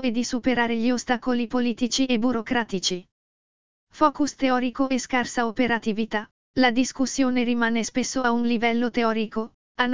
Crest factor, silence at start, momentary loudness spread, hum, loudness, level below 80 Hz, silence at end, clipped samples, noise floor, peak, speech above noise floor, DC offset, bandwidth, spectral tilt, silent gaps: 20 dB; 0 s; 5 LU; none; -24 LUFS; -54 dBFS; 0 s; under 0.1%; under -90 dBFS; -4 dBFS; over 67 dB; 1%; 7.6 kHz; -3.5 dB/octave; 3.12-3.87 s, 6.31-6.54 s, 9.54-9.75 s